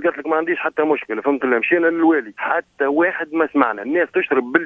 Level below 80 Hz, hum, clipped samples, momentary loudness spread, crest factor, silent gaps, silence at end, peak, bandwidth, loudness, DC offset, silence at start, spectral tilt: -66 dBFS; none; under 0.1%; 5 LU; 18 dB; none; 0 s; 0 dBFS; 3.8 kHz; -19 LUFS; under 0.1%; 0 s; -7.5 dB/octave